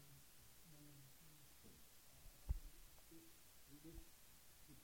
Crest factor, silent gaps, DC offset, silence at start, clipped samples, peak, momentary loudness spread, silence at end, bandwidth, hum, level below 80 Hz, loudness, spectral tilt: 28 dB; none; under 0.1%; 0 s; under 0.1%; -32 dBFS; 13 LU; 0 s; 17 kHz; none; -58 dBFS; -61 LUFS; -4 dB/octave